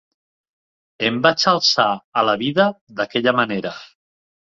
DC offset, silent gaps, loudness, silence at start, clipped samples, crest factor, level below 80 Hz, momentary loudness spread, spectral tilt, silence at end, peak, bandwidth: under 0.1%; 2.04-2.12 s, 2.81-2.87 s; -18 LUFS; 1 s; under 0.1%; 18 dB; -62 dBFS; 11 LU; -4 dB/octave; 0.65 s; -2 dBFS; 7.6 kHz